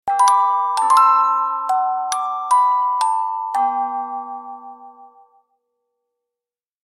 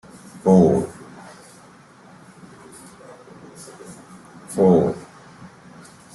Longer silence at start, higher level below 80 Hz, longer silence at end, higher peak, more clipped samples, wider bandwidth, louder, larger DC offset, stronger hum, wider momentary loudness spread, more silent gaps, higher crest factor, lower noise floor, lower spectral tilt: second, 0.05 s vs 0.35 s; second, -76 dBFS vs -56 dBFS; first, 1.8 s vs 1.15 s; about the same, -2 dBFS vs -4 dBFS; neither; first, 14.5 kHz vs 12 kHz; about the same, -17 LUFS vs -18 LUFS; neither; neither; second, 15 LU vs 28 LU; neither; about the same, 18 dB vs 20 dB; first, -90 dBFS vs -48 dBFS; second, 0.5 dB/octave vs -8 dB/octave